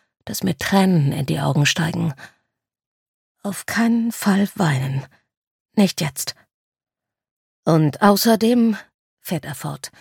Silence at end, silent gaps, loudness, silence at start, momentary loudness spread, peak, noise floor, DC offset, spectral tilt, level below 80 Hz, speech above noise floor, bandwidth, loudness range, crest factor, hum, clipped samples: 0.15 s; 2.86-3.35 s, 5.37-5.65 s, 6.54-6.72 s, 7.31-7.63 s, 8.94-9.17 s; -20 LUFS; 0.25 s; 14 LU; -2 dBFS; -75 dBFS; under 0.1%; -5.5 dB/octave; -58 dBFS; 57 dB; 17.5 kHz; 4 LU; 20 dB; none; under 0.1%